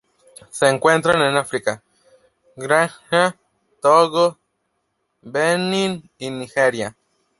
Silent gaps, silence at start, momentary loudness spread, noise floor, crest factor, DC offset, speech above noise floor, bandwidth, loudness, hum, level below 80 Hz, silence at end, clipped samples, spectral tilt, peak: none; 0.55 s; 15 LU; -72 dBFS; 20 dB; under 0.1%; 54 dB; 11.5 kHz; -18 LUFS; none; -62 dBFS; 0.5 s; under 0.1%; -4 dB/octave; 0 dBFS